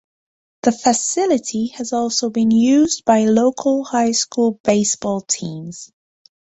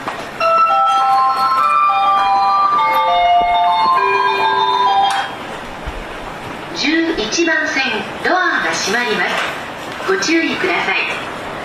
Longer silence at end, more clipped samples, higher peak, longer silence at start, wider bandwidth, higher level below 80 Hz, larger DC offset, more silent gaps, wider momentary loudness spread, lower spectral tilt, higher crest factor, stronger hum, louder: first, 0.7 s vs 0 s; neither; about the same, -2 dBFS vs -4 dBFS; first, 0.65 s vs 0 s; second, 8.2 kHz vs 14 kHz; second, -58 dBFS vs -44 dBFS; neither; first, 4.60-4.64 s vs none; second, 9 LU vs 13 LU; first, -4 dB/octave vs -2.5 dB/octave; first, 16 dB vs 10 dB; neither; second, -17 LUFS vs -14 LUFS